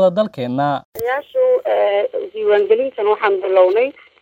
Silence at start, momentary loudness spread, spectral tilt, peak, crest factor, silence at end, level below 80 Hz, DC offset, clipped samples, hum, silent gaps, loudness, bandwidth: 0 s; 8 LU; -6.5 dB/octave; -2 dBFS; 14 dB; 0.3 s; -64 dBFS; under 0.1%; under 0.1%; none; 0.85-0.92 s; -17 LUFS; 16.5 kHz